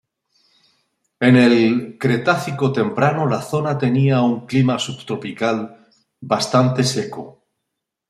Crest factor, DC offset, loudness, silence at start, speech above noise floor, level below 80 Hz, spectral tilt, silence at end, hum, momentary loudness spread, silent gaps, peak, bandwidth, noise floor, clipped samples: 16 dB; under 0.1%; -18 LUFS; 1.2 s; 62 dB; -60 dBFS; -6 dB/octave; 0.8 s; none; 12 LU; none; -2 dBFS; 13 kHz; -79 dBFS; under 0.1%